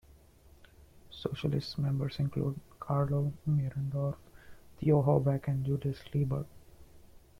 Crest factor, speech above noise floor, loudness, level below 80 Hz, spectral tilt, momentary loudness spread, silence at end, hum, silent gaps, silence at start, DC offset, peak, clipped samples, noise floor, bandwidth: 18 dB; 28 dB; -32 LUFS; -56 dBFS; -9 dB/octave; 11 LU; 0.3 s; none; none; 0.95 s; under 0.1%; -14 dBFS; under 0.1%; -59 dBFS; 6.2 kHz